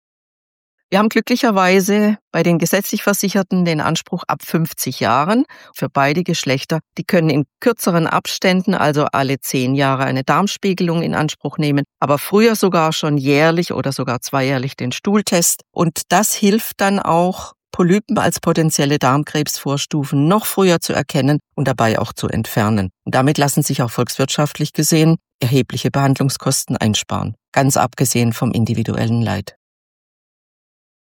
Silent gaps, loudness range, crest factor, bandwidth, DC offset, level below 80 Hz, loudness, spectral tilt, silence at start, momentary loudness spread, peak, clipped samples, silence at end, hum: 2.21-2.31 s, 25.34-25.39 s, 27.48-27.52 s; 2 LU; 14 dB; 17.5 kHz; under 0.1%; -52 dBFS; -16 LUFS; -5 dB/octave; 0.9 s; 7 LU; -2 dBFS; under 0.1%; 1.55 s; none